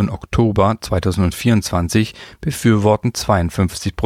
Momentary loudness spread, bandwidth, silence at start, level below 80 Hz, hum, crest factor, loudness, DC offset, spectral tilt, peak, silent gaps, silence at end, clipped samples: 5 LU; 16 kHz; 0 s; -34 dBFS; none; 16 dB; -17 LUFS; under 0.1%; -6 dB/octave; -2 dBFS; none; 0 s; under 0.1%